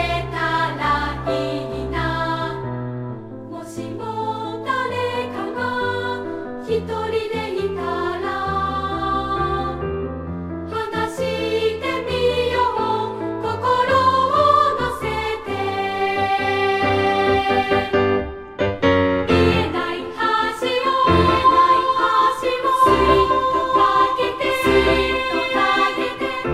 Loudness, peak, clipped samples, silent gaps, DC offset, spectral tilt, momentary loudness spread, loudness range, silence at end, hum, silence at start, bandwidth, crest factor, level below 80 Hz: -19 LUFS; -2 dBFS; under 0.1%; none; under 0.1%; -5.5 dB/octave; 11 LU; 9 LU; 0 s; none; 0 s; 15.5 kHz; 16 dB; -38 dBFS